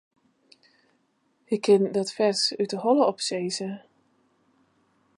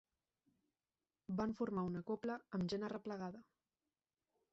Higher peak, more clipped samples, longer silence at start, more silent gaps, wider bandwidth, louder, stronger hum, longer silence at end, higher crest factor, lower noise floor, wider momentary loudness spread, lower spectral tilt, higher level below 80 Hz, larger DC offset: first, -8 dBFS vs -30 dBFS; neither; first, 1.5 s vs 1.3 s; neither; first, 11.5 kHz vs 7.6 kHz; first, -24 LUFS vs -44 LUFS; neither; first, 1.4 s vs 1.1 s; about the same, 20 dB vs 16 dB; second, -70 dBFS vs under -90 dBFS; about the same, 11 LU vs 9 LU; second, -4 dB/octave vs -6.5 dB/octave; about the same, -78 dBFS vs -74 dBFS; neither